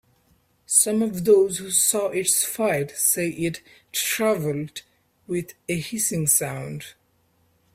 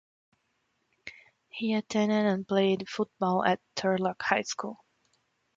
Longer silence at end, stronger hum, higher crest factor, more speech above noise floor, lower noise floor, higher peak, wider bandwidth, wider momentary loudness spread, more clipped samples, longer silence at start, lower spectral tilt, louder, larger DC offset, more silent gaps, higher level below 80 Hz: about the same, 0.85 s vs 0.8 s; neither; about the same, 24 dB vs 22 dB; second, 42 dB vs 48 dB; second, -65 dBFS vs -76 dBFS; first, 0 dBFS vs -8 dBFS; first, 16 kHz vs 7.8 kHz; second, 14 LU vs 18 LU; neither; second, 0.7 s vs 1.05 s; second, -3 dB/octave vs -5 dB/octave; first, -22 LUFS vs -29 LUFS; neither; neither; first, -62 dBFS vs -72 dBFS